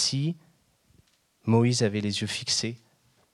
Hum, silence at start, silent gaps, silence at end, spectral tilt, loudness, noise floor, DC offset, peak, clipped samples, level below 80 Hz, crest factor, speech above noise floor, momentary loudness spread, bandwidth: none; 0 s; none; 0.55 s; -4.5 dB/octave; -26 LUFS; -64 dBFS; under 0.1%; -10 dBFS; under 0.1%; -68 dBFS; 18 dB; 38 dB; 13 LU; 12 kHz